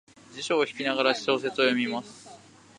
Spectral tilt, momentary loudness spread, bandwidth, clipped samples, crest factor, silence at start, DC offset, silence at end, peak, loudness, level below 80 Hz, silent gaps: -3.5 dB/octave; 20 LU; 11 kHz; under 0.1%; 22 dB; 0.3 s; under 0.1%; 0.4 s; -6 dBFS; -26 LUFS; -76 dBFS; none